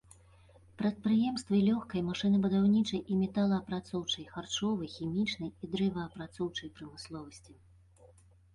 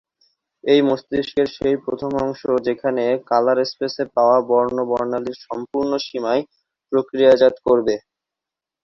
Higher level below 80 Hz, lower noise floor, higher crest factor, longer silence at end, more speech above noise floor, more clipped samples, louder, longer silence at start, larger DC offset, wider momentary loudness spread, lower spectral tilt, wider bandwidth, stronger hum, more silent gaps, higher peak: second, -62 dBFS vs -56 dBFS; second, -61 dBFS vs -87 dBFS; about the same, 14 dB vs 18 dB; first, 1 s vs 0.85 s; second, 29 dB vs 68 dB; neither; second, -32 LUFS vs -19 LUFS; first, 0.8 s vs 0.65 s; neither; first, 15 LU vs 9 LU; about the same, -6 dB/octave vs -6 dB/octave; first, 11 kHz vs 6.8 kHz; neither; neither; second, -18 dBFS vs -2 dBFS